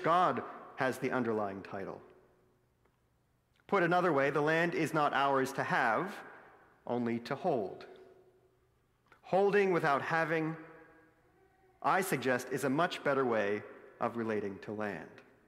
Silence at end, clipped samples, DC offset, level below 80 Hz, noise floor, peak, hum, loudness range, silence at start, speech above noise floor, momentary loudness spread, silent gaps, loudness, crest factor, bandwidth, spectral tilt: 0.25 s; under 0.1%; under 0.1%; -78 dBFS; -74 dBFS; -16 dBFS; none; 6 LU; 0 s; 41 dB; 16 LU; none; -33 LUFS; 18 dB; 16 kHz; -5.5 dB/octave